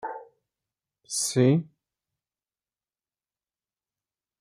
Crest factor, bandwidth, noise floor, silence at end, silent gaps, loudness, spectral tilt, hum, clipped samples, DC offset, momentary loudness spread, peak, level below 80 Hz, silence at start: 22 dB; 15 kHz; under -90 dBFS; 2.75 s; none; -24 LUFS; -5 dB/octave; none; under 0.1%; under 0.1%; 17 LU; -10 dBFS; -74 dBFS; 0.05 s